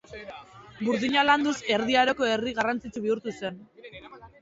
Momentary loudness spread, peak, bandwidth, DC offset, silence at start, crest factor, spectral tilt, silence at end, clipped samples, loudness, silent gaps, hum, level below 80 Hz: 23 LU; -8 dBFS; 8 kHz; under 0.1%; 0.1 s; 20 dB; -4 dB/octave; 0.15 s; under 0.1%; -25 LUFS; none; none; -60 dBFS